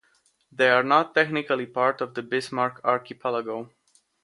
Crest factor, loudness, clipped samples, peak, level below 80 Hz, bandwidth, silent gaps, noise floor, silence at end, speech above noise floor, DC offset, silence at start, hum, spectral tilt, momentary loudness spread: 20 dB; -24 LUFS; under 0.1%; -4 dBFS; -74 dBFS; 11.5 kHz; none; -66 dBFS; 0.6 s; 42 dB; under 0.1%; 0.6 s; none; -5 dB/octave; 11 LU